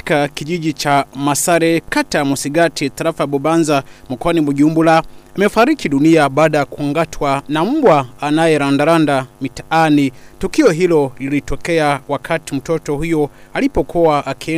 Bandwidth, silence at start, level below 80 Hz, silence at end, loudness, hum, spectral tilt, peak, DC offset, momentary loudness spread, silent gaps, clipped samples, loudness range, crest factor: 15.5 kHz; 0.05 s; -38 dBFS; 0 s; -15 LUFS; none; -5 dB/octave; -2 dBFS; under 0.1%; 8 LU; none; under 0.1%; 3 LU; 12 dB